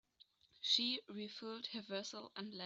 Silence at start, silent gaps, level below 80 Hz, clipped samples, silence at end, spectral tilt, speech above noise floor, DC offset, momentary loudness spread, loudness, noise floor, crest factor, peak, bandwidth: 0.6 s; none; -90 dBFS; under 0.1%; 0 s; -2.5 dB/octave; 28 dB; under 0.1%; 14 LU; -41 LUFS; -72 dBFS; 24 dB; -20 dBFS; 8.2 kHz